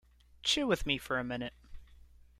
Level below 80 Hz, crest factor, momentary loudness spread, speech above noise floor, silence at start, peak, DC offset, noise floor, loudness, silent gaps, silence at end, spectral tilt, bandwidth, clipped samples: -52 dBFS; 22 dB; 10 LU; 25 dB; 0.45 s; -14 dBFS; under 0.1%; -58 dBFS; -33 LUFS; none; 0.35 s; -3.5 dB/octave; 16 kHz; under 0.1%